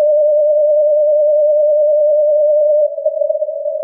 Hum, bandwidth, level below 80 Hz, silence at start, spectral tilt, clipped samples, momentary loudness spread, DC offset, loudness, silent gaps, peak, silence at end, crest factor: none; 0.8 kHz; under -90 dBFS; 0 s; -7.5 dB/octave; under 0.1%; 6 LU; under 0.1%; -13 LUFS; none; -4 dBFS; 0 s; 8 dB